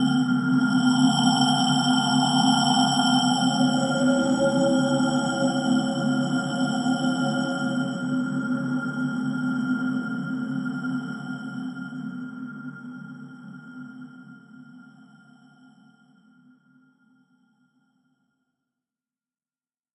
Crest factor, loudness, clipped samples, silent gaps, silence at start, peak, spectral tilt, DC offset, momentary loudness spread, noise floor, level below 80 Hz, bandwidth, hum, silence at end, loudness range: 18 dB; -23 LUFS; under 0.1%; none; 0 s; -6 dBFS; -5 dB/octave; under 0.1%; 18 LU; under -90 dBFS; -68 dBFS; 11 kHz; none; 5.1 s; 19 LU